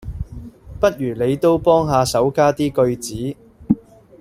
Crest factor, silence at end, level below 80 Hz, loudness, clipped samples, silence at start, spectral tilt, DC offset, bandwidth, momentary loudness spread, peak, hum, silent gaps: 18 dB; 0.4 s; -40 dBFS; -18 LUFS; under 0.1%; 0 s; -6 dB/octave; under 0.1%; 16 kHz; 17 LU; -2 dBFS; none; none